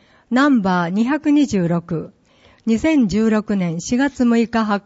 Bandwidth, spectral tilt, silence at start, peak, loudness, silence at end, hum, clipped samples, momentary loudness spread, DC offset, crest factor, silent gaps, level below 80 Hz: 8 kHz; -6 dB/octave; 0.3 s; -6 dBFS; -18 LUFS; 0.05 s; none; under 0.1%; 7 LU; under 0.1%; 12 dB; none; -48 dBFS